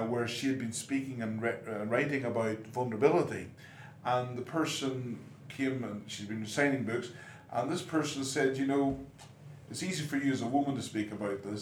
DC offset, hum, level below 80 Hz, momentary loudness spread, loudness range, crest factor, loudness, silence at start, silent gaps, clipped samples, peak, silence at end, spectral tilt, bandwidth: under 0.1%; none; -68 dBFS; 13 LU; 2 LU; 22 dB; -33 LUFS; 0 s; none; under 0.1%; -10 dBFS; 0 s; -5 dB/octave; 16.5 kHz